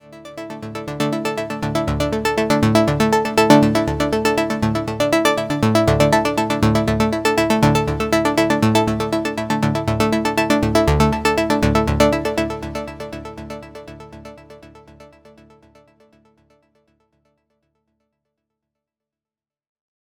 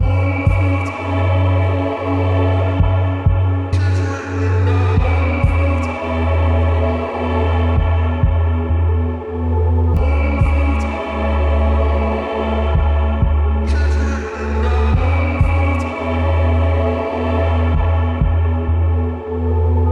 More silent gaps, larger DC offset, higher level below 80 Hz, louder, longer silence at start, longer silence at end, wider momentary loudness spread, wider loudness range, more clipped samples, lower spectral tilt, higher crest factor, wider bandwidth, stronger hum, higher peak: neither; neither; second, -34 dBFS vs -20 dBFS; about the same, -18 LUFS vs -17 LUFS; about the same, 0.1 s vs 0 s; first, 5 s vs 0 s; first, 16 LU vs 4 LU; first, 8 LU vs 1 LU; neither; second, -5.5 dB/octave vs -8.5 dB/octave; first, 20 dB vs 14 dB; first, over 20 kHz vs 6.6 kHz; neither; about the same, 0 dBFS vs -2 dBFS